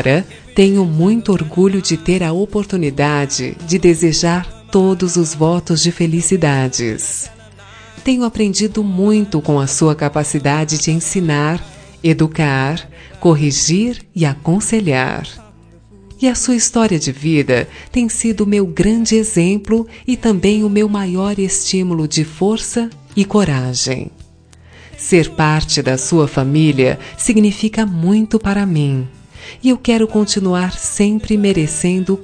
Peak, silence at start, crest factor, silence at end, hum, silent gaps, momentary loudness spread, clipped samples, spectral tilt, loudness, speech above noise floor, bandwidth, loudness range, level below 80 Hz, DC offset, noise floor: 0 dBFS; 0 s; 14 dB; 0 s; none; none; 6 LU; under 0.1%; -5 dB/octave; -15 LUFS; 29 dB; 10.5 kHz; 2 LU; -38 dBFS; under 0.1%; -43 dBFS